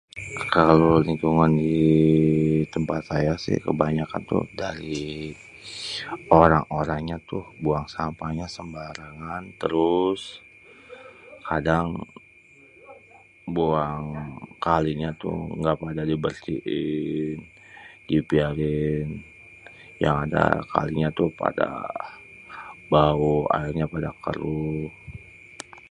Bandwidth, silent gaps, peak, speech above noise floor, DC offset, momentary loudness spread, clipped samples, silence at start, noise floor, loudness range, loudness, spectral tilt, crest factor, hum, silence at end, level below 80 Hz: 10.5 kHz; none; 0 dBFS; 29 dB; under 0.1%; 21 LU; under 0.1%; 0.15 s; -53 dBFS; 7 LU; -24 LUFS; -7.5 dB/octave; 24 dB; none; 0.1 s; -44 dBFS